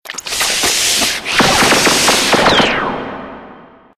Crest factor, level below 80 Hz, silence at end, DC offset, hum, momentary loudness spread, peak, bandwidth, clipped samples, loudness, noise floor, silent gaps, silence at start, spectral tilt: 14 dB; -40 dBFS; 0.35 s; under 0.1%; none; 14 LU; 0 dBFS; 19.5 kHz; under 0.1%; -11 LUFS; -39 dBFS; none; 0.05 s; -1.5 dB/octave